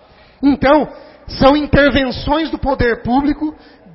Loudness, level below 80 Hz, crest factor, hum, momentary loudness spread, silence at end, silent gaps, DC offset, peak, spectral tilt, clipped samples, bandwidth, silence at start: -14 LUFS; -30 dBFS; 14 dB; none; 10 LU; 0.4 s; none; under 0.1%; 0 dBFS; -9 dB/octave; under 0.1%; 5.8 kHz; 0.4 s